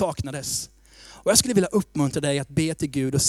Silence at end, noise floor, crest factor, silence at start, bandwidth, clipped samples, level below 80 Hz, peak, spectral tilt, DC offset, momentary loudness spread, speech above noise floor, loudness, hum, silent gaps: 0 s; -48 dBFS; 22 dB; 0 s; 16 kHz; under 0.1%; -48 dBFS; -2 dBFS; -4 dB/octave; under 0.1%; 11 LU; 25 dB; -23 LUFS; none; none